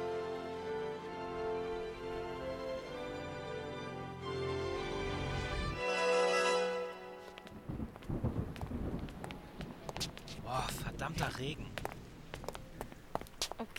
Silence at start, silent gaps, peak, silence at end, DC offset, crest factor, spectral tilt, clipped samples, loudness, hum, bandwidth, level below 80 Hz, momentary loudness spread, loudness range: 0 s; none; -18 dBFS; 0 s; under 0.1%; 22 dB; -4.5 dB/octave; under 0.1%; -39 LUFS; none; 17.5 kHz; -52 dBFS; 14 LU; 7 LU